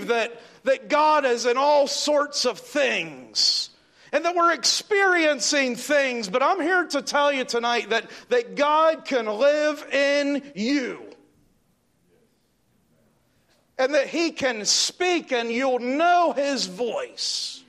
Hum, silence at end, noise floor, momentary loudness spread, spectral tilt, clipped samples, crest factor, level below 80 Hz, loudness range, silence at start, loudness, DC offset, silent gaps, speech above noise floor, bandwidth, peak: none; 0.1 s; -66 dBFS; 7 LU; -1.5 dB/octave; under 0.1%; 16 dB; -74 dBFS; 8 LU; 0 s; -22 LUFS; under 0.1%; none; 44 dB; 14 kHz; -8 dBFS